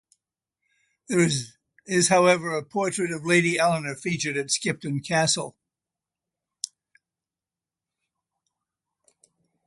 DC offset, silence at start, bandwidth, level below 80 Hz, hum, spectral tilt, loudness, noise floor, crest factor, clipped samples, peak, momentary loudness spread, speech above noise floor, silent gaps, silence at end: under 0.1%; 1.1 s; 11.5 kHz; -68 dBFS; none; -3.5 dB/octave; -23 LUFS; under -90 dBFS; 22 dB; under 0.1%; -6 dBFS; 17 LU; over 66 dB; none; 3 s